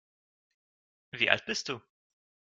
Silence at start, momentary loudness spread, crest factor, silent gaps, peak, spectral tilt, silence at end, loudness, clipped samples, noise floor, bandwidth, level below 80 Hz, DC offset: 1.15 s; 15 LU; 32 dB; none; -4 dBFS; -2 dB/octave; 0.65 s; -29 LUFS; under 0.1%; under -90 dBFS; 9 kHz; -74 dBFS; under 0.1%